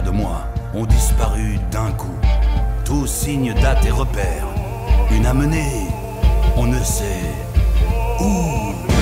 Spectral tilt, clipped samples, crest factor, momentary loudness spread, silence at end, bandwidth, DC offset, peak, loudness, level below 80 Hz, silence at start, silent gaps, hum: -5.5 dB/octave; under 0.1%; 12 dB; 7 LU; 0 s; 16 kHz; under 0.1%; -4 dBFS; -19 LUFS; -18 dBFS; 0 s; none; none